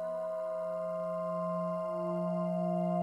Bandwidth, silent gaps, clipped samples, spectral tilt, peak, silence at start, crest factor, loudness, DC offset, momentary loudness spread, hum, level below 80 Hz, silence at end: 8.6 kHz; none; under 0.1%; -9.5 dB/octave; -22 dBFS; 0 s; 12 dB; -35 LUFS; under 0.1%; 4 LU; none; -84 dBFS; 0 s